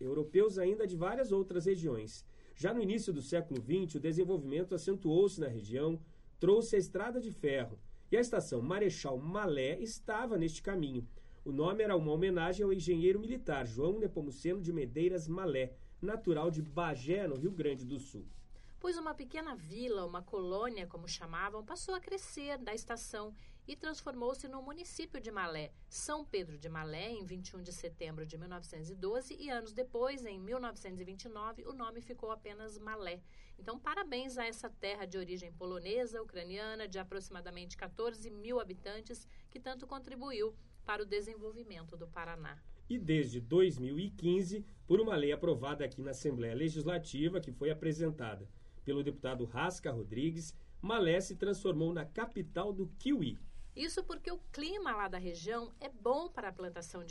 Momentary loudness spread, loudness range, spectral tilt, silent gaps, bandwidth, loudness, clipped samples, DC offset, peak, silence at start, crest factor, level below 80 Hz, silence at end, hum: 14 LU; 9 LU; -5.5 dB/octave; none; 11.5 kHz; -38 LUFS; under 0.1%; under 0.1%; -18 dBFS; 0 s; 18 dB; -54 dBFS; 0 s; none